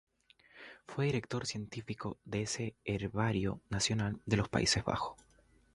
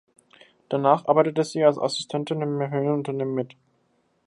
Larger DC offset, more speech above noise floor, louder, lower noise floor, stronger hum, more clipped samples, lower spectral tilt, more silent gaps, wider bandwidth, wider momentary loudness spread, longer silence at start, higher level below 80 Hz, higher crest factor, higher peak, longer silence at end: neither; second, 29 dB vs 45 dB; second, -35 LUFS vs -24 LUFS; second, -64 dBFS vs -68 dBFS; neither; neither; second, -4.5 dB/octave vs -6 dB/octave; neither; about the same, 11.5 kHz vs 11.5 kHz; first, 12 LU vs 8 LU; second, 0.55 s vs 0.7 s; first, -56 dBFS vs -74 dBFS; about the same, 22 dB vs 20 dB; second, -14 dBFS vs -4 dBFS; second, 0.6 s vs 0.8 s